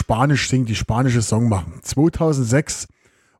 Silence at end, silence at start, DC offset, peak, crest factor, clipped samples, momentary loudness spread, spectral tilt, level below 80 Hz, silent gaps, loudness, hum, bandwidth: 0.55 s; 0 s; under 0.1%; -4 dBFS; 16 dB; under 0.1%; 8 LU; -5.5 dB/octave; -38 dBFS; none; -19 LUFS; none; 13.5 kHz